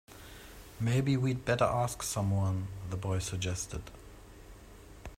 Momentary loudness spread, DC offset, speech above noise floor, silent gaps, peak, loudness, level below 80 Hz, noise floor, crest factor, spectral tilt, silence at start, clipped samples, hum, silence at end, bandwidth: 24 LU; under 0.1%; 20 dB; none; -14 dBFS; -32 LUFS; -52 dBFS; -52 dBFS; 20 dB; -5.5 dB/octave; 0.1 s; under 0.1%; none; 0 s; 16 kHz